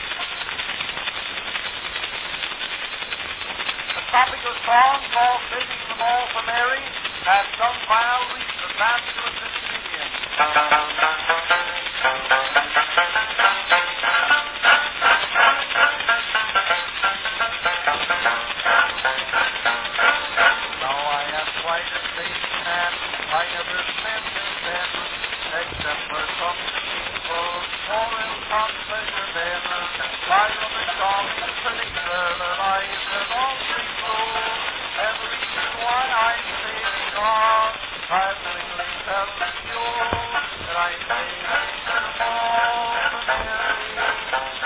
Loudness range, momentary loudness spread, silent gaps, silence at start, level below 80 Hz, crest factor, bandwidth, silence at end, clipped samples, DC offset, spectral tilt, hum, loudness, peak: 6 LU; 8 LU; none; 0 s; -50 dBFS; 22 dB; 4 kHz; 0 s; under 0.1%; under 0.1%; -5.5 dB/octave; none; -21 LUFS; -2 dBFS